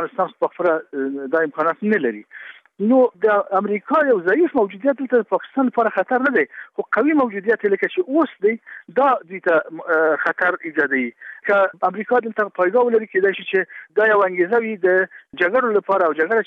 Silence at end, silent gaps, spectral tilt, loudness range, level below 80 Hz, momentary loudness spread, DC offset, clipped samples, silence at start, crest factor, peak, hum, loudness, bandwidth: 0.05 s; none; -8 dB/octave; 2 LU; -70 dBFS; 7 LU; under 0.1%; under 0.1%; 0 s; 14 dB; -4 dBFS; none; -19 LUFS; 5.4 kHz